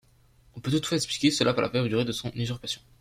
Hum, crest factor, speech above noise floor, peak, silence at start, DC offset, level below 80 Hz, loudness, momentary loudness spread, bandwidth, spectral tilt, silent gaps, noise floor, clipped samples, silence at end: none; 20 dB; 33 dB; -8 dBFS; 0.55 s; under 0.1%; -56 dBFS; -27 LUFS; 10 LU; 16 kHz; -4.5 dB/octave; none; -60 dBFS; under 0.1%; 0.2 s